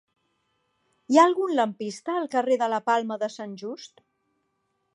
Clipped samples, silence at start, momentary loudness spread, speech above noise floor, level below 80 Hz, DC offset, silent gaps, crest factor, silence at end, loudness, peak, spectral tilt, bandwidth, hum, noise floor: under 0.1%; 1.1 s; 17 LU; 51 dB; -84 dBFS; under 0.1%; none; 22 dB; 1.1 s; -24 LUFS; -6 dBFS; -4.5 dB/octave; 11 kHz; none; -75 dBFS